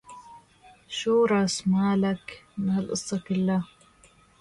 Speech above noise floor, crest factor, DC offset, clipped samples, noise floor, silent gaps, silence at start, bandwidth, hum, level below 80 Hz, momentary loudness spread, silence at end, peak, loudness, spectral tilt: 33 dB; 14 dB; under 0.1%; under 0.1%; -58 dBFS; none; 0.1 s; 11.5 kHz; none; -62 dBFS; 16 LU; 0.75 s; -14 dBFS; -26 LUFS; -5.5 dB/octave